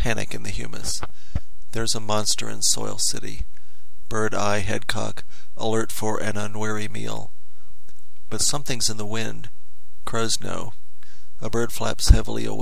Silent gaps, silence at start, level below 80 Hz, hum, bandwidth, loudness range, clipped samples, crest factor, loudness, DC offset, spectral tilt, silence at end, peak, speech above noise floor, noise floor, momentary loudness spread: none; 0 s; -32 dBFS; none; 16 kHz; 4 LU; under 0.1%; 28 dB; -25 LUFS; 10%; -3 dB/octave; 0 s; 0 dBFS; 28 dB; -53 dBFS; 14 LU